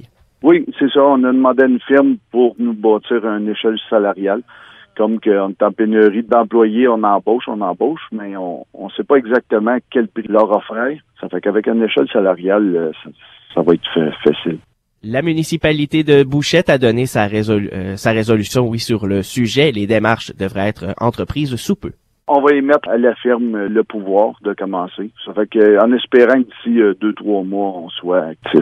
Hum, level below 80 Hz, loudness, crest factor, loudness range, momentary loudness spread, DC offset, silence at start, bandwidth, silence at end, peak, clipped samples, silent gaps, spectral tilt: none; -48 dBFS; -15 LUFS; 14 dB; 3 LU; 11 LU; under 0.1%; 0.45 s; 14 kHz; 0 s; 0 dBFS; under 0.1%; none; -6 dB/octave